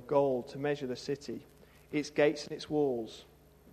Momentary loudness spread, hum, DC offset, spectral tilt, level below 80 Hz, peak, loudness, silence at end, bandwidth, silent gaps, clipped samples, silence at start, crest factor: 15 LU; none; under 0.1%; -5.5 dB/octave; -66 dBFS; -14 dBFS; -33 LUFS; 0 s; 14 kHz; none; under 0.1%; 0 s; 20 dB